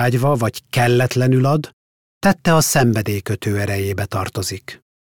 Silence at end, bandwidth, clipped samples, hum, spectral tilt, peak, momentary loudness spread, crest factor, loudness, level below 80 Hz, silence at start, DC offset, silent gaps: 0.4 s; 18 kHz; under 0.1%; none; -5.5 dB/octave; -4 dBFS; 9 LU; 14 dB; -18 LUFS; -48 dBFS; 0 s; under 0.1%; 1.73-2.21 s